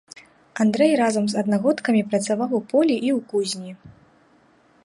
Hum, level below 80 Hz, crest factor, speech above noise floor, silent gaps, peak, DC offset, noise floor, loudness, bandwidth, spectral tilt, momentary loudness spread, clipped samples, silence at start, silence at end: none; -66 dBFS; 16 dB; 36 dB; none; -6 dBFS; under 0.1%; -57 dBFS; -21 LUFS; 11.5 kHz; -5 dB/octave; 9 LU; under 0.1%; 0.55 s; 0.95 s